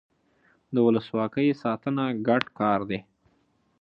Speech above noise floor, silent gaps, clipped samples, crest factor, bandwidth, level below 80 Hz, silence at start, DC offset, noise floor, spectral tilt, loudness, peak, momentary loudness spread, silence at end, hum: 43 dB; none; under 0.1%; 20 dB; 6 kHz; -66 dBFS; 0.7 s; under 0.1%; -68 dBFS; -8.5 dB/octave; -26 LUFS; -6 dBFS; 7 LU; 0.8 s; none